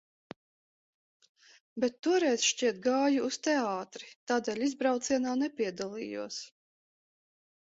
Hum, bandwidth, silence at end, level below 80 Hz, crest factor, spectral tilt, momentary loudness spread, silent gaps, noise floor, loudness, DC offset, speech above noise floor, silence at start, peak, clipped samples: none; 8 kHz; 1.2 s; -76 dBFS; 18 dB; -2.5 dB/octave; 13 LU; 1.99-2.03 s, 4.16-4.27 s; under -90 dBFS; -31 LUFS; under 0.1%; over 59 dB; 1.75 s; -14 dBFS; under 0.1%